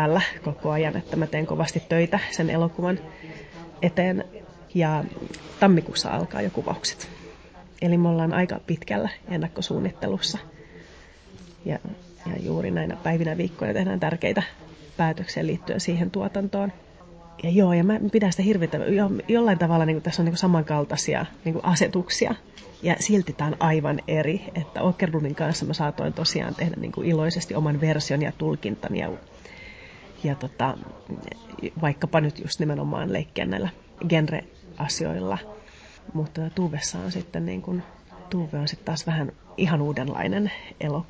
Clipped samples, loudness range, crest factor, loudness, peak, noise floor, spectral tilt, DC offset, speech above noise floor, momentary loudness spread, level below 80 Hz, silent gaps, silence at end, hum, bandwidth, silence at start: under 0.1%; 7 LU; 18 dB; -25 LUFS; -6 dBFS; -48 dBFS; -5.5 dB/octave; under 0.1%; 24 dB; 14 LU; -52 dBFS; none; 0.05 s; none; 8 kHz; 0 s